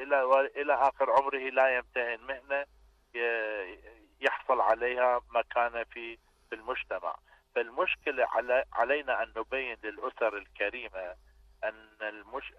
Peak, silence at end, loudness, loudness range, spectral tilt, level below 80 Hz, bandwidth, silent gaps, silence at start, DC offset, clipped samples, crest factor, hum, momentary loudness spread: -14 dBFS; 0.1 s; -31 LUFS; 4 LU; -4 dB/octave; -62 dBFS; 8.4 kHz; none; 0 s; under 0.1%; under 0.1%; 18 dB; none; 13 LU